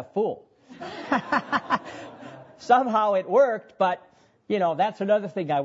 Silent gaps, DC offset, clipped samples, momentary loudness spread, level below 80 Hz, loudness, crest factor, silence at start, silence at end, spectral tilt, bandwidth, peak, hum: none; under 0.1%; under 0.1%; 20 LU; -70 dBFS; -24 LUFS; 18 dB; 0 s; 0 s; -6 dB/octave; 8 kHz; -6 dBFS; none